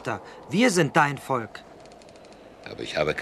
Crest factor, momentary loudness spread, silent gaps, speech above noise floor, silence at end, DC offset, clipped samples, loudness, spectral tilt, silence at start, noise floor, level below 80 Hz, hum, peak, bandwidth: 22 dB; 20 LU; none; 23 dB; 0 s; under 0.1%; under 0.1%; -24 LUFS; -4.5 dB/octave; 0 s; -48 dBFS; -58 dBFS; none; -4 dBFS; 14 kHz